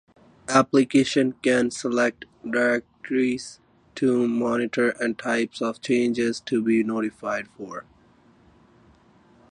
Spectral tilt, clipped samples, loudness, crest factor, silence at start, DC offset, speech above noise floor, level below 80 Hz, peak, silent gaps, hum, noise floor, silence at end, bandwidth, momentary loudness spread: -5 dB/octave; under 0.1%; -23 LUFS; 20 dB; 0.5 s; under 0.1%; 34 dB; -64 dBFS; -4 dBFS; none; none; -57 dBFS; 1.75 s; 10.5 kHz; 14 LU